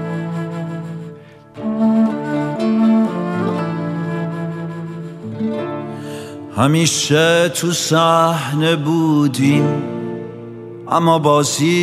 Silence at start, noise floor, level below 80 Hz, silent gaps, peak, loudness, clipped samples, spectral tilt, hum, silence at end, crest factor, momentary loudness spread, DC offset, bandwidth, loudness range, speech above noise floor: 0 s; -38 dBFS; -60 dBFS; none; 0 dBFS; -17 LUFS; under 0.1%; -5 dB/octave; none; 0 s; 16 dB; 16 LU; under 0.1%; 15 kHz; 7 LU; 24 dB